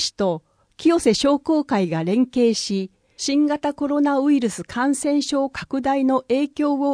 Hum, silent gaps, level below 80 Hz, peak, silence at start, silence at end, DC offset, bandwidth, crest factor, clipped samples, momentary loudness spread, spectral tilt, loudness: none; none; -56 dBFS; -4 dBFS; 0 s; 0 s; under 0.1%; 10.5 kHz; 16 dB; under 0.1%; 7 LU; -4.5 dB/octave; -21 LUFS